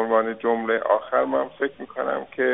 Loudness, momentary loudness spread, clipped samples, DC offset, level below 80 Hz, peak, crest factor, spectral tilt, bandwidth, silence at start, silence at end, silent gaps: -24 LUFS; 7 LU; under 0.1%; under 0.1%; -66 dBFS; -6 dBFS; 16 dB; -2.5 dB/octave; 4 kHz; 0 s; 0 s; none